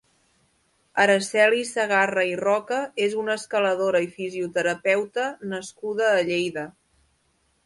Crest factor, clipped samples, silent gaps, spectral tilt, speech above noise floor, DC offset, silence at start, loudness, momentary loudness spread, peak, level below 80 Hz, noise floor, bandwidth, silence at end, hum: 18 dB; under 0.1%; none; -3.5 dB/octave; 44 dB; under 0.1%; 0.95 s; -23 LUFS; 11 LU; -6 dBFS; -70 dBFS; -68 dBFS; 11.5 kHz; 0.95 s; none